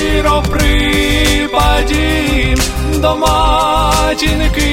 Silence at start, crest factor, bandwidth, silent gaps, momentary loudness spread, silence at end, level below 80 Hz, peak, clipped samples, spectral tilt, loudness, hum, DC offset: 0 s; 12 dB; 16.5 kHz; none; 2 LU; 0 s; -16 dBFS; 0 dBFS; under 0.1%; -4.5 dB/octave; -12 LUFS; none; under 0.1%